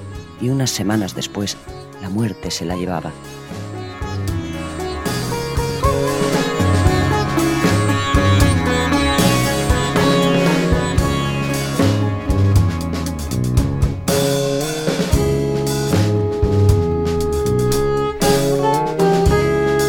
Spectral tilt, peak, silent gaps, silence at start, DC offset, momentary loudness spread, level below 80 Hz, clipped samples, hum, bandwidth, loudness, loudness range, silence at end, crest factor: -5.5 dB/octave; 0 dBFS; none; 0 s; under 0.1%; 10 LU; -28 dBFS; under 0.1%; none; 18.5 kHz; -18 LUFS; 8 LU; 0 s; 16 dB